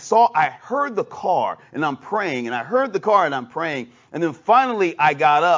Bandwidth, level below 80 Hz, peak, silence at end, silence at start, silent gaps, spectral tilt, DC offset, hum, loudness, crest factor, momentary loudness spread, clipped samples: 7.6 kHz; -72 dBFS; -2 dBFS; 0 s; 0 s; none; -5 dB/octave; under 0.1%; none; -20 LUFS; 16 dB; 9 LU; under 0.1%